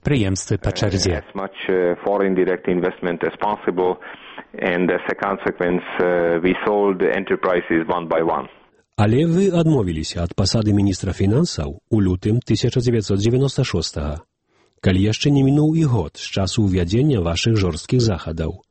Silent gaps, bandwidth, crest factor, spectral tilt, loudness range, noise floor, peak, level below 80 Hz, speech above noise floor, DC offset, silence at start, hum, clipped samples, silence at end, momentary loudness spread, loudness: none; 8.8 kHz; 18 dB; -6 dB/octave; 3 LU; -62 dBFS; -2 dBFS; -38 dBFS; 43 dB; under 0.1%; 0.05 s; none; under 0.1%; 0.15 s; 8 LU; -19 LUFS